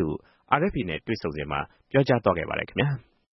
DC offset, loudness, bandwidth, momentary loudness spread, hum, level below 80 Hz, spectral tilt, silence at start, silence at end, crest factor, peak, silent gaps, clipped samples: under 0.1%; -26 LUFS; 6 kHz; 8 LU; none; -50 dBFS; -8.5 dB/octave; 0 s; 0.3 s; 24 dB; -4 dBFS; none; under 0.1%